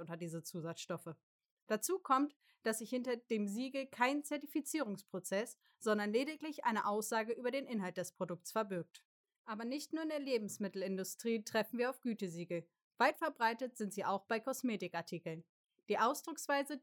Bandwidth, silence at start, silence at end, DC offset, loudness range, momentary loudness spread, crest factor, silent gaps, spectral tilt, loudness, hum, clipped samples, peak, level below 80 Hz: over 20 kHz; 0 s; 0.05 s; under 0.1%; 3 LU; 10 LU; 22 dB; 1.23-1.39 s, 1.51-1.67 s, 2.36-2.40 s, 9.05-9.24 s, 9.39-9.45 s, 12.82-12.91 s, 15.49-15.64 s; -4 dB/octave; -39 LUFS; none; under 0.1%; -18 dBFS; under -90 dBFS